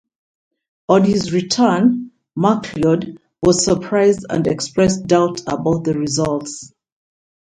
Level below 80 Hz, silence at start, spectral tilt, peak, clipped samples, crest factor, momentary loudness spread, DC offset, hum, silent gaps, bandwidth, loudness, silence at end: -48 dBFS; 0.9 s; -5.5 dB/octave; 0 dBFS; under 0.1%; 18 dB; 10 LU; under 0.1%; none; none; 9.6 kHz; -17 LUFS; 0.9 s